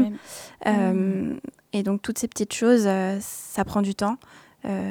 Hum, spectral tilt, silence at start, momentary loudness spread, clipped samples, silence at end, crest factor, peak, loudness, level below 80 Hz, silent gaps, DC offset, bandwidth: none; -5.5 dB/octave; 0 s; 14 LU; under 0.1%; 0 s; 18 dB; -6 dBFS; -25 LUFS; -56 dBFS; none; under 0.1%; 19 kHz